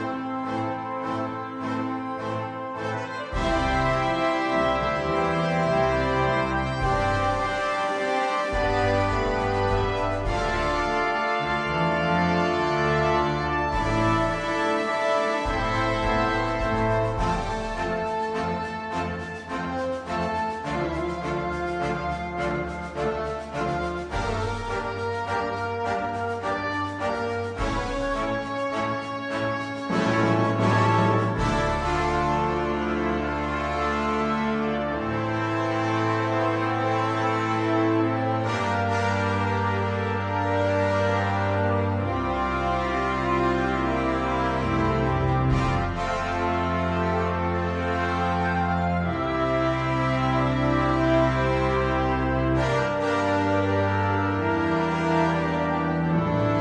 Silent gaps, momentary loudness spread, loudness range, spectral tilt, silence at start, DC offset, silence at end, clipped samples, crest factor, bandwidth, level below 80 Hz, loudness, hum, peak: none; 6 LU; 5 LU; -6.5 dB/octave; 0 s; under 0.1%; 0 s; under 0.1%; 14 dB; 10.5 kHz; -38 dBFS; -25 LUFS; none; -10 dBFS